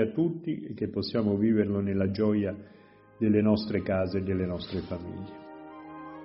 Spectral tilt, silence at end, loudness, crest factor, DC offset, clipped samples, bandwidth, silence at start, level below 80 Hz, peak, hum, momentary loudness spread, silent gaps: -7 dB/octave; 0 s; -29 LUFS; 18 dB; under 0.1%; under 0.1%; 5.8 kHz; 0 s; -58 dBFS; -10 dBFS; none; 18 LU; none